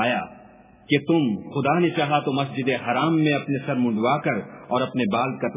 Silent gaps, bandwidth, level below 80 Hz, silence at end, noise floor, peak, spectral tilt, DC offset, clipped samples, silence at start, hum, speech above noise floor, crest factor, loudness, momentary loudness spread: none; 3.9 kHz; -64 dBFS; 0 s; -49 dBFS; -4 dBFS; -10.5 dB/octave; under 0.1%; under 0.1%; 0 s; none; 27 dB; 18 dB; -23 LUFS; 5 LU